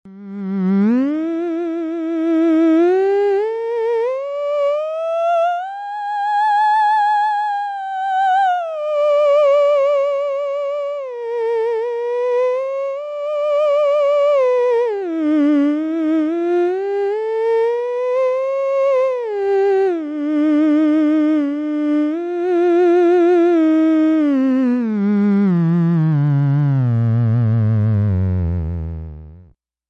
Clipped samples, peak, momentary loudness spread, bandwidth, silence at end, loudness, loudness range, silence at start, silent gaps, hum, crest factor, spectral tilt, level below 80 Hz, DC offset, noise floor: under 0.1%; -8 dBFS; 8 LU; 8.2 kHz; 0.5 s; -17 LUFS; 4 LU; 0.05 s; none; 60 Hz at -55 dBFS; 8 dB; -9 dB/octave; -40 dBFS; under 0.1%; -49 dBFS